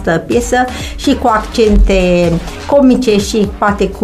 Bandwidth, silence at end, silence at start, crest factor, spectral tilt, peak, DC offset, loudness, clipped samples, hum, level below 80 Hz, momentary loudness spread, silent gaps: 14 kHz; 0 s; 0 s; 10 dB; -5.5 dB/octave; 0 dBFS; under 0.1%; -12 LUFS; under 0.1%; none; -20 dBFS; 6 LU; none